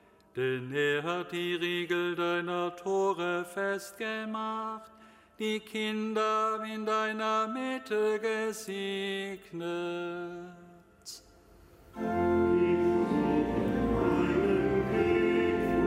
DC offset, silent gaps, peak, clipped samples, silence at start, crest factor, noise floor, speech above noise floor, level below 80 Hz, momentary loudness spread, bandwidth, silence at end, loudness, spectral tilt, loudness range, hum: under 0.1%; none; -16 dBFS; under 0.1%; 0.35 s; 16 dB; -57 dBFS; 25 dB; -52 dBFS; 12 LU; 15.5 kHz; 0 s; -30 LUFS; -5.5 dB/octave; 8 LU; none